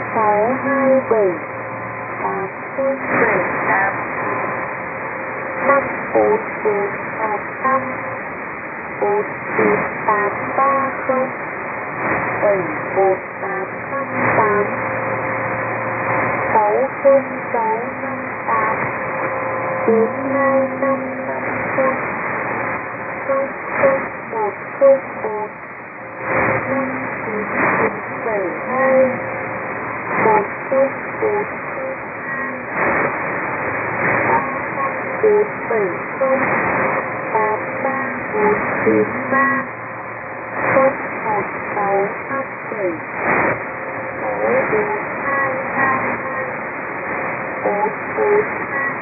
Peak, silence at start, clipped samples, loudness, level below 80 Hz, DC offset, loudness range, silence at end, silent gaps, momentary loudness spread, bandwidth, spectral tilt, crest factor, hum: 0 dBFS; 0 s; under 0.1%; -19 LUFS; -56 dBFS; under 0.1%; 2 LU; 0 s; none; 9 LU; 2.8 kHz; -12.5 dB/octave; 18 dB; none